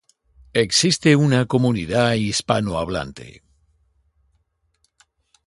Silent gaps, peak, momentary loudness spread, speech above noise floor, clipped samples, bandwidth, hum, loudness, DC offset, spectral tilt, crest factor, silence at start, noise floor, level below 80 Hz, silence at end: none; -2 dBFS; 11 LU; 49 dB; under 0.1%; 11.5 kHz; none; -19 LUFS; under 0.1%; -4.5 dB/octave; 20 dB; 0.55 s; -68 dBFS; -48 dBFS; 2.15 s